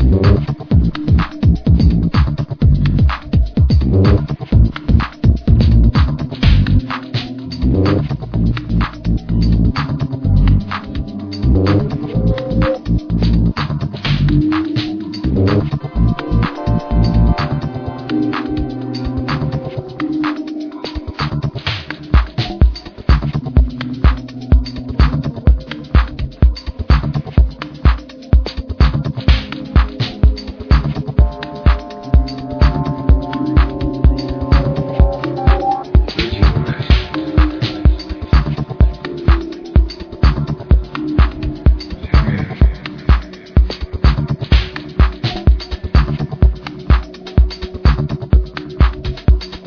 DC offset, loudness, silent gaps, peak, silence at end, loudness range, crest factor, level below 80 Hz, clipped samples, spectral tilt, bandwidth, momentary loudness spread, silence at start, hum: under 0.1%; -16 LUFS; none; 0 dBFS; 0 s; 4 LU; 14 dB; -16 dBFS; under 0.1%; -8.5 dB/octave; 5.4 kHz; 8 LU; 0 s; none